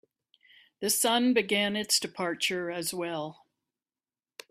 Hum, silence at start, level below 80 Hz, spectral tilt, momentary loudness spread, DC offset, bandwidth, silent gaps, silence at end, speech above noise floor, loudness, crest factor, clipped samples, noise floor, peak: none; 0.8 s; -74 dBFS; -2 dB/octave; 11 LU; under 0.1%; 16 kHz; none; 1.2 s; over 61 dB; -28 LUFS; 20 dB; under 0.1%; under -90 dBFS; -12 dBFS